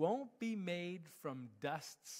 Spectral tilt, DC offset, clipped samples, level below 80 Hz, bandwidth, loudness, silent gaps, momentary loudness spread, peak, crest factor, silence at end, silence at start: -5 dB/octave; under 0.1%; under 0.1%; under -90 dBFS; 16 kHz; -44 LUFS; none; 7 LU; -24 dBFS; 18 dB; 0 s; 0 s